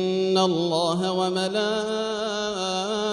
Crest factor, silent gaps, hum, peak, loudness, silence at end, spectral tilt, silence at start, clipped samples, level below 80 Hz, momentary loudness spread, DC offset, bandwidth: 16 dB; none; none; -8 dBFS; -24 LUFS; 0 s; -4.5 dB/octave; 0 s; under 0.1%; -62 dBFS; 5 LU; under 0.1%; 11 kHz